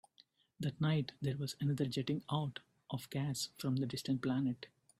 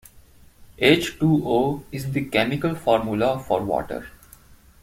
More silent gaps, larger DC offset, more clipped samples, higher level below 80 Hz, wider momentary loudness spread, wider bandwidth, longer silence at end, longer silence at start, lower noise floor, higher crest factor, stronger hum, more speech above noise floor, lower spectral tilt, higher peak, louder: neither; neither; neither; second, -72 dBFS vs -48 dBFS; about the same, 8 LU vs 9 LU; about the same, 15.5 kHz vs 16.5 kHz; second, 0.35 s vs 0.75 s; about the same, 0.6 s vs 0.6 s; first, -70 dBFS vs -50 dBFS; about the same, 16 dB vs 20 dB; neither; about the same, 32 dB vs 29 dB; about the same, -6 dB/octave vs -6 dB/octave; second, -24 dBFS vs -2 dBFS; second, -39 LUFS vs -22 LUFS